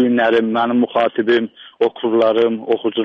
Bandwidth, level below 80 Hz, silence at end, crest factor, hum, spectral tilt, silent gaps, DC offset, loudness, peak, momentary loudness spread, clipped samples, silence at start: 6 kHz; -64 dBFS; 0 s; 12 dB; none; -7 dB/octave; none; under 0.1%; -16 LUFS; -4 dBFS; 5 LU; under 0.1%; 0 s